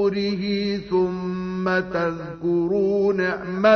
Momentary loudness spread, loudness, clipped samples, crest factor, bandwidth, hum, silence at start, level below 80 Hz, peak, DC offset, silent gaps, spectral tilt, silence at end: 6 LU; -23 LUFS; under 0.1%; 18 dB; 6.4 kHz; none; 0 s; -52 dBFS; -4 dBFS; under 0.1%; none; -7.5 dB/octave; 0 s